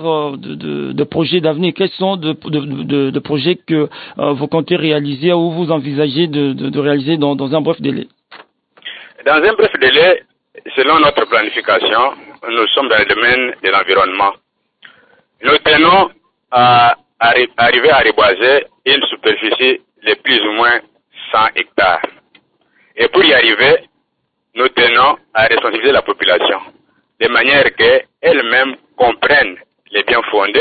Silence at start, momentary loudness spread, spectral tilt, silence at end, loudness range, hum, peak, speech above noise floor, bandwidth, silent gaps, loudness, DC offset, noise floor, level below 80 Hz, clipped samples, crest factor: 0 s; 10 LU; -10.5 dB/octave; 0 s; 6 LU; none; 0 dBFS; 56 dB; 4.8 kHz; none; -12 LUFS; under 0.1%; -69 dBFS; -48 dBFS; under 0.1%; 14 dB